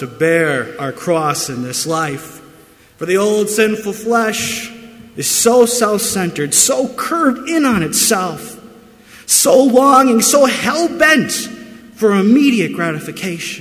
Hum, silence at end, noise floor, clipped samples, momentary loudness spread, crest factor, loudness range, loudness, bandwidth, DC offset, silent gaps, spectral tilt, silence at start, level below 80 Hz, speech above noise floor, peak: none; 0 s; -45 dBFS; under 0.1%; 14 LU; 14 dB; 6 LU; -13 LUFS; 16 kHz; under 0.1%; none; -3 dB/octave; 0 s; -52 dBFS; 31 dB; 0 dBFS